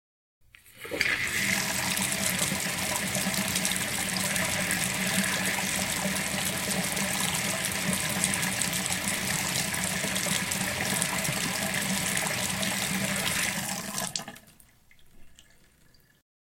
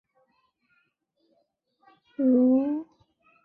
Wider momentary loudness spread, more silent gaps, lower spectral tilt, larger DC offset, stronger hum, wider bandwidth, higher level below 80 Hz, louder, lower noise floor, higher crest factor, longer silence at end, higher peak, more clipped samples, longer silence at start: second, 2 LU vs 15 LU; neither; second, -2 dB/octave vs -10.5 dB/octave; neither; neither; first, 17 kHz vs 2.8 kHz; first, -56 dBFS vs -76 dBFS; second, -27 LUFS vs -24 LUFS; second, -60 dBFS vs -73 dBFS; first, 26 dB vs 16 dB; first, 1.2 s vs 0.6 s; first, -4 dBFS vs -12 dBFS; neither; second, 0.65 s vs 2.2 s